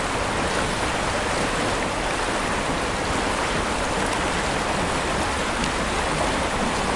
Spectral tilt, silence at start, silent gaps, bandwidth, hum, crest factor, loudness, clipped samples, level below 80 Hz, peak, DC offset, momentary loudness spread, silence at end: -3.5 dB/octave; 0 s; none; 11.5 kHz; none; 20 dB; -23 LUFS; under 0.1%; -36 dBFS; -4 dBFS; under 0.1%; 1 LU; 0 s